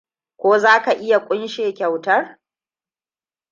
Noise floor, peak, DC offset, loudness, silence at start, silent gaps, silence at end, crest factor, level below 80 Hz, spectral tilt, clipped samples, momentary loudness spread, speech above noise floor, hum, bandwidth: under -90 dBFS; -2 dBFS; under 0.1%; -17 LUFS; 0.4 s; none; 1.2 s; 18 dB; -74 dBFS; -4 dB/octave; under 0.1%; 10 LU; over 73 dB; none; 7.6 kHz